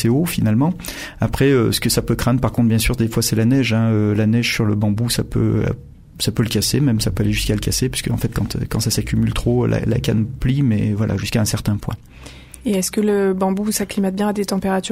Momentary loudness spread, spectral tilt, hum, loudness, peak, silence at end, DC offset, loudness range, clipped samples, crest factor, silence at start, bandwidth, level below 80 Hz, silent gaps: 6 LU; -5.5 dB/octave; none; -18 LUFS; -4 dBFS; 0 s; under 0.1%; 3 LU; under 0.1%; 14 dB; 0 s; 16 kHz; -34 dBFS; none